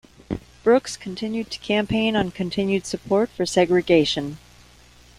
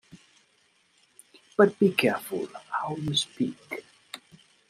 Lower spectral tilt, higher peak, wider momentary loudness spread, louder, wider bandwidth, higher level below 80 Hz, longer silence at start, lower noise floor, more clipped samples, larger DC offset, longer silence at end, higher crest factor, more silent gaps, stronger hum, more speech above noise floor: about the same, -5 dB/octave vs -4.5 dB/octave; about the same, -4 dBFS vs -4 dBFS; second, 14 LU vs 22 LU; first, -22 LUFS vs -26 LUFS; second, 13.5 kHz vs 15 kHz; first, -50 dBFS vs -66 dBFS; first, 0.3 s vs 0.15 s; second, -50 dBFS vs -66 dBFS; neither; neither; first, 0.8 s vs 0.55 s; second, 18 dB vs 24 dB; neither; neither; second, 29 dB vs 41 dB